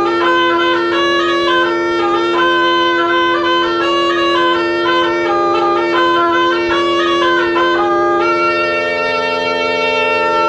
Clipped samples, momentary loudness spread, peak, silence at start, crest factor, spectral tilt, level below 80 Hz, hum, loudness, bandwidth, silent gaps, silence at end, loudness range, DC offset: under 0.1%; 2 LU; -2 dBFS; 0 s; 12 dB; -4 dB/octave; -48 dBFS; none; -13 LUFS; 8.4 kHz; none; 0 s; 1 LU; under 0.1%